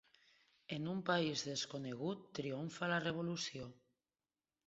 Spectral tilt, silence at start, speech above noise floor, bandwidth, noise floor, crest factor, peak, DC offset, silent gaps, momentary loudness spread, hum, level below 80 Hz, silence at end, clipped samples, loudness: -3.5 dB/octave; 0.7 s; over 49 dB; 8 kHz; under -90 dBFS; 22 dB; -20 dBFS; under 0.1%; none; 10 LU; none; -78 dBFS; 0.95 s; under 0.1%; -41 LUFS